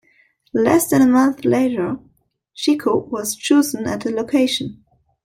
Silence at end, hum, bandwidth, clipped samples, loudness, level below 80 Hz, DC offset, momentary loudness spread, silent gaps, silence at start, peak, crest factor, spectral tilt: 0.5 s; none; 16.5 kHz; under 0.1%; -18 LUFS; -56 dBFS; under 0.1%; 10 LU; none; 0.55 s; 0 dBFS; 18 dB; -4.5 dB/octave